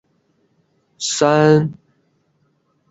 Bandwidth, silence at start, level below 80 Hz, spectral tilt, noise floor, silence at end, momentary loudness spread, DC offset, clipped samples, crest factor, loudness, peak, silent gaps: 8.2 kHz; 1 s; -60 dBFS; -5 dB/octave; -63 dBFS; 1.15 s; 13 LU; under 0.1%; under 0.1%; 18 dB; -16 LUFS; -2 dBFS; none